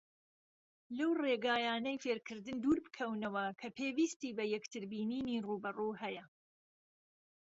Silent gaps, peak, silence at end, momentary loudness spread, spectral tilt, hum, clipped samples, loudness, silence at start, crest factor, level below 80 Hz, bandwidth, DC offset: 4.16-4.20 s; -22 dBFS; 1.2 s; 9 LU; -3 dB/octave; none; under 0.1%; -38 LUFS; 0.9 s; 18 dB; -74 dBFS; 7.6 kHz; under 0.1%